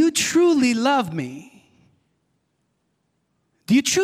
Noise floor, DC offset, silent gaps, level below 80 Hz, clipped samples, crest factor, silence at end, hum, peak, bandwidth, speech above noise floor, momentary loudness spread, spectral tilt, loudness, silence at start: -71 dBFS; under 0.1%; none; -66 dBFS; under 0.1%; 14 dB; 0 s; none; -8 dBFS; 16 kHz; 51 dB; 15 LU; -3.5 dB/octave; -19 LUFS; 0 s